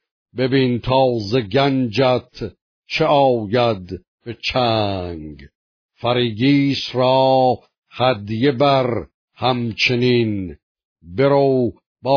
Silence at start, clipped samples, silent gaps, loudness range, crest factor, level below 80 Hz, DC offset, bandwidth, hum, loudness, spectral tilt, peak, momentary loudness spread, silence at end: 0.35 s; under 0.1%; 2.61-2.83 s, 4.08-4.18 s, 5.55-5.89 s, 7.78-7.82 s, 9.14-9.28 s, 10.63-10.75 s, 10.84-10.96 s, 11.86-11.96 s; 3 LU; 16 dB; -48 dBFS; under 0.1%; 5.4 kHz; none; -18 LUFS; -7 dB/octave; -2 dBFS; 16 LU; 0 s